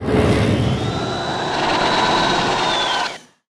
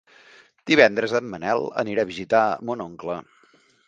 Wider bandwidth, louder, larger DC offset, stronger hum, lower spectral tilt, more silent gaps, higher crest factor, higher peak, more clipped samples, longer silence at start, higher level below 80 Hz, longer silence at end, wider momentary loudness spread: first, 13.5 kHz vs 9 kHz; first, -18 LUFS vs -22 LUFS; neither; neither; about the same, -4.5 dB/octave vs -5 dB/octave; neither; second, 14 dB vs 24 dB; second, -4 dBFS vs 0 dBFS; neither; second, 0 s vs 0.65 s; first, -36 dBFS vs -62 dBFS; second, 0.3 s vs 0.65 s; second, 6 LU vs 15 LU